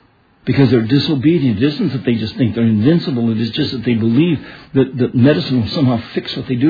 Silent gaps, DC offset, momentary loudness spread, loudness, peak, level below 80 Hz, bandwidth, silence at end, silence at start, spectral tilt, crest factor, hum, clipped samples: none; under 0.1%; 7 LU; -15 LUFS; 0 dBFS; -48 dBFS; 5 kHz; 0 s; 0.45 s; -9 dB/octave; 14 dB; none; under 0.1%